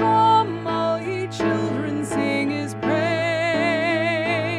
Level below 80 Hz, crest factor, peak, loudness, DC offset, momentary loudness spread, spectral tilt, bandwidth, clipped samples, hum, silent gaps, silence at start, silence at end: -56 dBFS; 14 dB; -6 dBFS; -21 LUFS; under 0.1%; 7 LU; -5.5 dB/octave; 12.5 kHz; under 0.1%; none; none; 0 s; 0 s